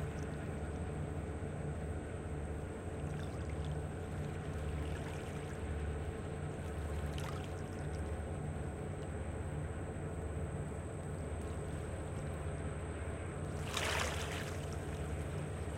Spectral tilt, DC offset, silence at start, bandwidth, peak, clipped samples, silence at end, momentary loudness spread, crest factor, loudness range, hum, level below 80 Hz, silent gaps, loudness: -5.5 dB/octave; under 0.1%; 0 s; 16 kHz; -20 dBFS; under 0.1%; 0 s; 3 LU; 20 dB; 2 LU; none; -48 dBFS; none; -42 LUFS